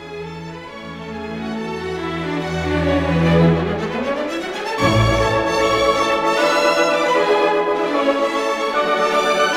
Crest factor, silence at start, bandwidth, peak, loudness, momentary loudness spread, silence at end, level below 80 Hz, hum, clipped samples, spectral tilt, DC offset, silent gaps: 16 dB; 0 s; 16 kHz; -2 dBFS; -18 LUFS; 14 LU; 0 s; -36 dBFS; none; under 0.1%; -5.5 dB/octave; under 0.1%; none